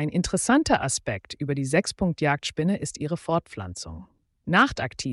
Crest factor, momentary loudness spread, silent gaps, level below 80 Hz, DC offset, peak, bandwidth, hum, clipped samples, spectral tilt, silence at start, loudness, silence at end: 16 dB; 15 LU; none; -48 dBFS; under 0.1%; -8 dBFS; 11.5 kHz; none; under 0.1%; -4.5 dB/octave; 0 s; -25 LUFS; 0 s